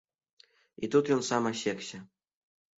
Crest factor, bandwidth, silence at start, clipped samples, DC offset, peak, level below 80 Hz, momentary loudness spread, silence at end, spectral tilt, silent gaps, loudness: 20 dB; 8 kHz; 0.8 s; under 0.1%; under 0.1%; -14 dBFS; -74 dBFS; 15 LU; 0.75 s; -4.5 dB/octave; none; -30 LUFS